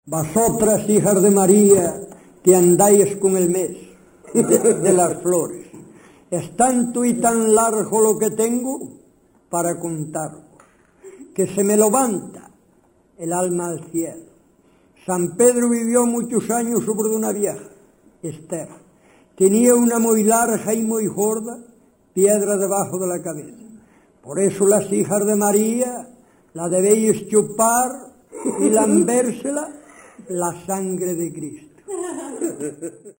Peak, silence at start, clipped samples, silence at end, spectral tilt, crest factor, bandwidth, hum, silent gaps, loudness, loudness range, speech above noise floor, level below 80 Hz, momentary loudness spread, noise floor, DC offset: 0 dBFS; 0.05 s; under 0.1%; 0.1 s; -5.5 dB/octave; 18 dB; 16.5 kHz; none; none; -18 LUFS; 7 LU; 39 dB; -58 dBFS; 16 LU; -57 dBFS; under 0.1%